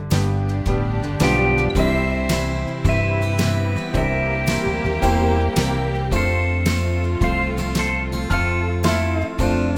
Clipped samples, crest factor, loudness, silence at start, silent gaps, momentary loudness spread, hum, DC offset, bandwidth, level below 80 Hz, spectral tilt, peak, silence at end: under 0.1%; 16 dB; -20 LUFS; 0 s; none; 4 LU; none; under 0.1%; 17.5 kHz; -28 dBFS; -6 dB/octave; -4 dBFS; 0 s